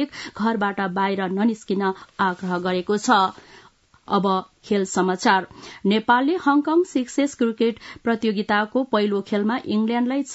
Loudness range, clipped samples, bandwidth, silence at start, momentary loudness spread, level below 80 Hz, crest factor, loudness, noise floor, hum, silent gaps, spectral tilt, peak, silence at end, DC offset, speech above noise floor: 2 LU; under 0.1%; 8 kHz; 0 s; 6 LU; -64 dBFS; 18 dB; -22 LUFS; -53 dBFS; none; none; -5 dB/octave; -4 dBFS; 0 s; under 0.1%; 32 dB